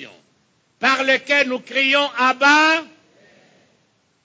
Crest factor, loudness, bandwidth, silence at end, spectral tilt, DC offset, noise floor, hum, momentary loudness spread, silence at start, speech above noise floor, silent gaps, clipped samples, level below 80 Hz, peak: 18 dB; -16 LUFS; 8 kHz; 1.4 s; -1.5 dB/octave; under 0.1%; -63 dBFS; none; 7 LU; 0 s; 46 dB; none; under 0.1%; -76 dBFS; -2 dBFS